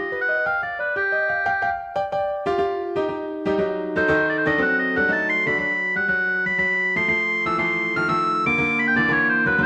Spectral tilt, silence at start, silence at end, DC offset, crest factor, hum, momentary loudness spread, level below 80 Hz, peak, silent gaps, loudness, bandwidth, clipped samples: -6 dB/octave; 0 s; 0 s; under 0.1%; 14 dB; none; 6 LU; -52 dBFS; -8 dBFS; none; -21 LUFS; 8.8 kHz; under 0.1%